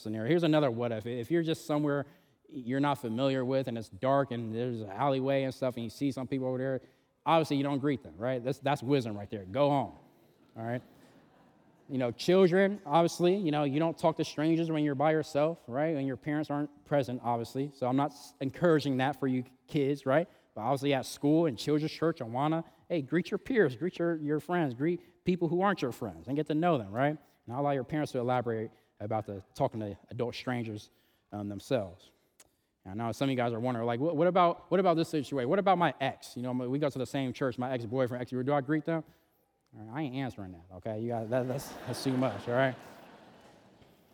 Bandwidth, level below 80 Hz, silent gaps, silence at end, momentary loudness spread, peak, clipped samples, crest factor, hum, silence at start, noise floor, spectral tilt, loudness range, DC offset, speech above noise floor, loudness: 19 kHz; -72 dBFS; none; 0.95 s; 11 LU; -12 dBFS; under 0.1%; 18 dB; none; 0 s; -73 dBFS; -7 dB/octave; 7 LU; under 0.1%; 42 dB; -31 LUFS